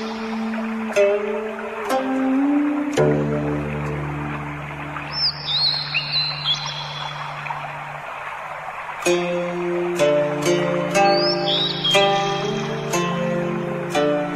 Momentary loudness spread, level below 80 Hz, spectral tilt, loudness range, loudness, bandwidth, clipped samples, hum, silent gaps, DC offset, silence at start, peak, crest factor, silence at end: 12 LU; -48 dBFS; -4.5 dB/octave; 6 LU; -21 LUFS; 14.5 kHz; under 0.1%; none; none; under 0.1%; 0 s; -2 dBFS; 18 dB; 0 s